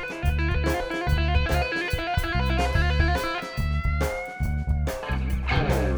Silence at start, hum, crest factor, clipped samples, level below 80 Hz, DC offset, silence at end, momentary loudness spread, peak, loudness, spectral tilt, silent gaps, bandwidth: 0 s; none; 16 dB; under 0.1%; -28 dBFS; under 0.1%; 0 s; 5 LU; -10 dBFS; -26 LUFS; -6 dB/octave; none; over 20 kHz